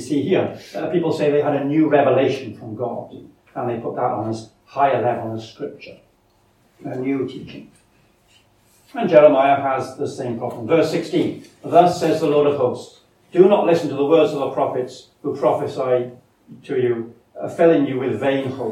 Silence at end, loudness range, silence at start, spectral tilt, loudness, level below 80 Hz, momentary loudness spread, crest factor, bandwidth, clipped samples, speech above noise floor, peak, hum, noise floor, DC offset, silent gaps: 0 s; 7 LU; 0 s; -7 dB/octave; -19 LUFS; -64 dBFS; 17 LU; 20 dB; 13.5 kHz; under 0.1%; 40 dB; 0 dBFS; none; -59 dBFS; under 0.1%; none